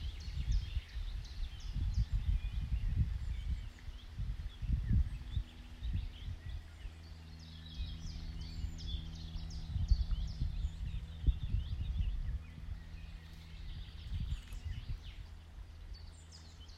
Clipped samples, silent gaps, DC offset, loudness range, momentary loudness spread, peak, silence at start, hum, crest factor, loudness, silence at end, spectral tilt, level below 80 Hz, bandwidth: under 0.1%; none; under 0.1%; 7 LU; 15 LU; -18 dBFS; 0 s; none; 22 dB; -42 LUFS; 0 s; -6 dB/octave; -40 dBFS; 8.8 kHz